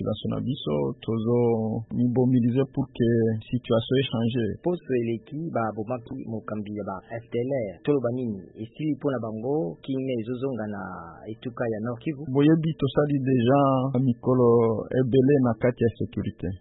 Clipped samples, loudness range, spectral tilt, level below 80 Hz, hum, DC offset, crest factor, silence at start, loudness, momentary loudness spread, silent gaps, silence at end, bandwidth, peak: under 0.1%; 8 LU; -12 dB/octave; -56 dBFS; none; under 0.1%; 16 dB; 0 s; -25 LUFS; 12 LU; none; 0.05 s; 4.1 kHz; -8 dBFS